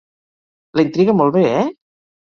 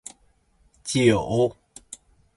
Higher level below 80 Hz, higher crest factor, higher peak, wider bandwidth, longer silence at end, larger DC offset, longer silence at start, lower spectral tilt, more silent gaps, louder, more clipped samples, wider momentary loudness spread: second, -58 dBFS vs -52 dBFS; second, 16 dB vs 22 dB; about the same, -2 dBFS vs -4 dBFS; second, 7 kHz vs 11.5 kHz; first, 0.65 s vs 0.4 s; neither; about the same, 0.75 s vs 0.85 s; first, -8 dB/octave vs -5.5 dB/octave; neither; first, -16 LUFS vs -22 LUFS; neither; second, 9 LU vs 23 LU